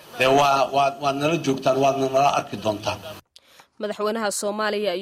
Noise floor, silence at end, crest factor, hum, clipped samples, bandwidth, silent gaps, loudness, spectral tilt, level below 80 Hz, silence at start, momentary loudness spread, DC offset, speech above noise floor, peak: -53 dBFS; 0 s; 14 dB; none; under 0.1%; 15.5 kHz; none; -22 LUFS; -4 dB/octave; -60 dBFS; 0.05 s; 11 LU; under 0.1%; 31 dB; -8 dBFS